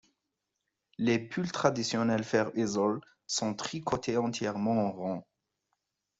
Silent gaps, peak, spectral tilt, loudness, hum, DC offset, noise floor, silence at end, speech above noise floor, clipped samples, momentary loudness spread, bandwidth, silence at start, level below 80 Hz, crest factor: none; -10 dBFS; -5 dB/octave; -31 LUFS; none; under 0.1%; -85 dBFS; 1 s; 54 dB; under 0.1%; 7 LU; 8.2 kHz; 1 s; -68 dBFS; 22 dB